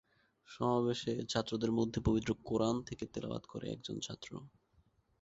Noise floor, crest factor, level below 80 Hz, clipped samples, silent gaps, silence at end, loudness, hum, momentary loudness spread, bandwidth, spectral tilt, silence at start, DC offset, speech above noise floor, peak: -72 dBFS; 20 dB; -56 dBFS; under 0.1%; none; 0.75 s; -37 LUFS; none; 11 LU; 8 kHz; -5.5 dB/octave; 0.5 s; under 0.1%; 36 dB; -16 dBFS